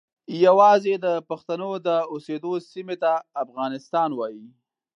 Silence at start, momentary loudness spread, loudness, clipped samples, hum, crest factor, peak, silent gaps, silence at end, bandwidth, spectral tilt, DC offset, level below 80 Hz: 0.3 s; 15 LU; -23 LUFS; under 0.1%; none; 18 dB; -4 dBFS; none; 0.5 s; 7.6 kHz; -6 dB/octave; under 0.1%; -82 dBFS